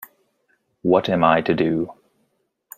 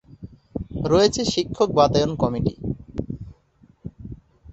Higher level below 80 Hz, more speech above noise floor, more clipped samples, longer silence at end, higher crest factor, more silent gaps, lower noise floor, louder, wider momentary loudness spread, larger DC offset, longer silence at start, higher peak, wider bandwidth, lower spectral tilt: second, -58 dBFS vs -42 dBFS; first, 51 dB vs 37 dB; neither; first, 0.85 s vs 0 s; about the same, 20 dB vs 20 dB; neither; first, -69 dBFS vs -57 dBFS; about the same, -20 LUFS vs -22 LUFS; second, 10 LU vs 23 LU; neither; second, 0 s vs 0.2 s; about the same, -2 dBFS vs -4 dBFS; first, 15.5 kHz vs 8.2 kHz; first, -7 dB/octave vs -5.5 dB/octave